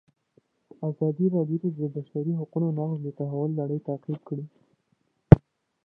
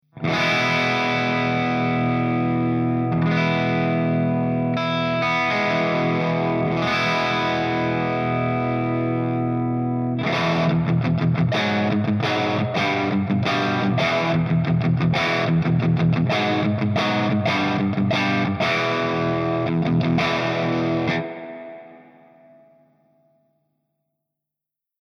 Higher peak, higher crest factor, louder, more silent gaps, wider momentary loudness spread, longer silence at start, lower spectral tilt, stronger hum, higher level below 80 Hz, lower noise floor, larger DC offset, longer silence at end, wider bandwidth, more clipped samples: first, 0 dBFS vs -8 dBFS; first, 26 dB vs 12 dB; second, -26 LUFS vs -21 LUFS; neither; first, 16 LU vs 3 LU; first, 0.8 s vs 0.15 s; first, -12.5 dB/octave vs -7 dB/octave; neither; first, -44 dBFS vs -56 dBFS; second, -72 dBFS vs -84 dBFS; neither; second, 0.5 s vs 3 s; second, 3.7 kHz vs 6.8 kHz; neither